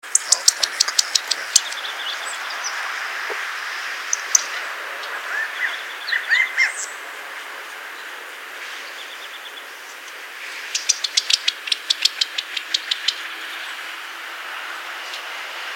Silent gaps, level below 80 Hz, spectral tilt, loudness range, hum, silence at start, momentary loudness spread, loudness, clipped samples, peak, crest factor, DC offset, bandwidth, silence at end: none; -80 dBFS; 4.5 dB/octave; 8 LU; none; 0.05 s; 15 LU; -21 LUFS; under 0.1%; 0 dBFS; 24 dB; under 0.1%; 17 kHz; 0 s